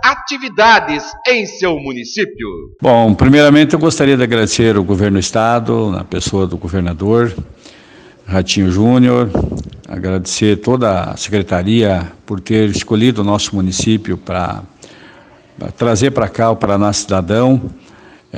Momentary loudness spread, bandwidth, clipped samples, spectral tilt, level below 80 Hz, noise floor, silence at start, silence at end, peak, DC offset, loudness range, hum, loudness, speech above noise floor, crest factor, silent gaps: 11 LU; 10 kHz; 0.1%; -5.5 dB/octave; -36 dBFS; -42 dBFS; 0 s; 0 s; 0 dBFS; under 0.1%; 6 LU; none; -13 LUFS; 29 dB; 14 dB; none